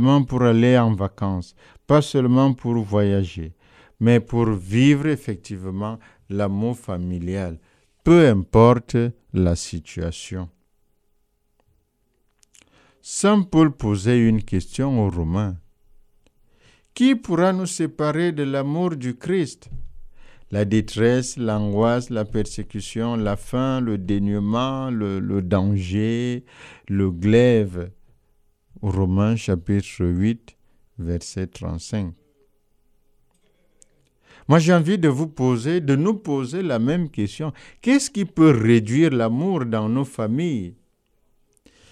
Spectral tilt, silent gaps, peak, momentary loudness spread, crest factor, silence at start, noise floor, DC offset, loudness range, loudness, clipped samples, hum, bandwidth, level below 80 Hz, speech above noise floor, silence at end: -7 dB/octave; none; 0 dBFS; 14 LU; 20 dB; 0 s; -67 dBFS; under 0.1%; 8 LU; -21 LUFS; under 0.1%; none; 13 kHz; -44 dBFS; 47 dB; 1.2 s